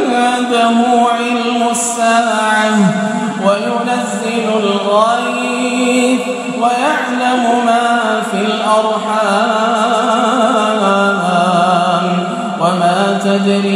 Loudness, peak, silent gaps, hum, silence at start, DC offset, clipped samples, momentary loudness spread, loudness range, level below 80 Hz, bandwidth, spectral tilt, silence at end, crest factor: -13 LUFS; 0 dBFS; none; none; 0 s; under 0.1%; under 0.1%; 4 LU; 2 LU; -64 dBFS; 15 kHz; -4.5 dB/octave; 0 s; 12 dB